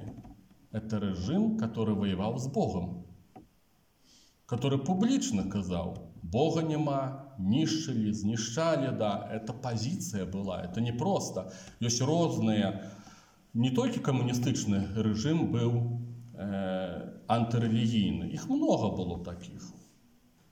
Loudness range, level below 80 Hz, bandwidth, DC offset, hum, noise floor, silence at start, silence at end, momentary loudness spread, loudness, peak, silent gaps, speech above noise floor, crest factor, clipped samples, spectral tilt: 3 LU; -62 dBFS; 16.5 kHz; under 0.1%; none; -68 dBFS; 0 s; 0.7 s; 12 LU; -31 LUFS; -14 dBFS; none; 38 dB; 18 dB; under 0.1%; -6 dB/octave